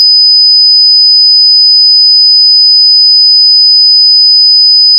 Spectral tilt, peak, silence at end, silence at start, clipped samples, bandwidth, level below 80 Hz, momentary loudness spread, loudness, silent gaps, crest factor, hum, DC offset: 5 dB/octave; 0 dBFS; 0 s; 0 s; under 0.1%; 5.4 kHz; under -90 dBFS; 0 LU; 0 LUFS; none; 4 dB; none; under 0.1%